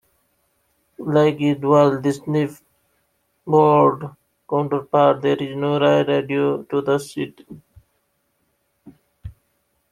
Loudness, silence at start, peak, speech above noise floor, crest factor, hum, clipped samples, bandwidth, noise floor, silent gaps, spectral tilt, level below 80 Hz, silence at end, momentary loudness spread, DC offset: -19 LUFS; 1 s; -2 dBFS; 51 dB; 18 dB; none; under 0.1%; 14 kHz; -69 dBFS; none; -7 dB/octave; -56 dBFS; 0.6 s; 14 LU; under 0.1%